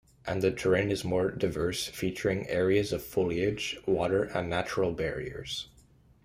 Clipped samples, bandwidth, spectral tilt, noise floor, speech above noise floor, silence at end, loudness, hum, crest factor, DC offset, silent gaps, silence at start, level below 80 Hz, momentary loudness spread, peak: under 0.1%; 15.5 kHz; -5.5 dB/octave; -60 dBFS; 30 dB; 0.6 s; -30 LUFS; none; 18 dB; under 0.1%; none; 0.25 s; -54 dBFS; 9 LU; -12 dBFS